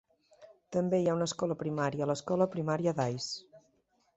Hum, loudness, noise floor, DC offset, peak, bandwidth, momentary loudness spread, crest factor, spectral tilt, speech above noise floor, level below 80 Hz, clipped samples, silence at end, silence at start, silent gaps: none; -32 LUFS; -73 dBFS; under 0.1%; -14 dBFS; 8.2 kHz; 7 LU; 20 dB; -6 dB/octave; 41 dB; -70 dBFS; under 0.1%; 0.6 s; 0.4 s; none